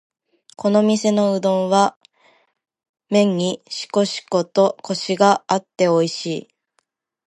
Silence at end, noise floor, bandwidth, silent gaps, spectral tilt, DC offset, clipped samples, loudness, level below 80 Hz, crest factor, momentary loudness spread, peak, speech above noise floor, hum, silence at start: 0.85 s; -69 dBFS; 11.5 kHz; 1.96-2.01 s, 2.89-2.94 s; -5 dB/octave; under 0.1%; under 0.1%; -19 LUFS; -70 dBFS; 18 dB; 8 LU; 0 dBFS; 51 dB; none; 0.6 s